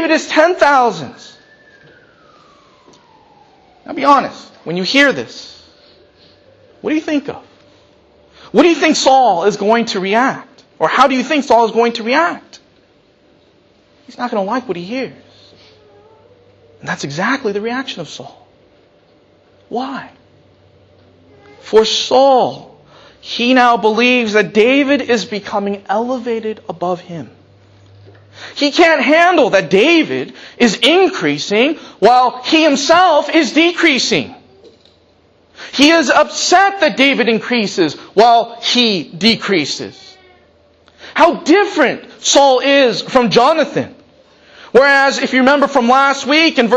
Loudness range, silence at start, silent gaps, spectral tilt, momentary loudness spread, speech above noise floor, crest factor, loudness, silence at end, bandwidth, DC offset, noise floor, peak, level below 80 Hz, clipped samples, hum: 11 LU; 0 s; none; -3.5 dB/octave; 15 LU; 39 dB; 14 dB; -12 LUFS; 0 s; 10.5 kHz; under 0.1%; -51 dBFS; 0 dBFS; -56 dBFS; under 0.1%; none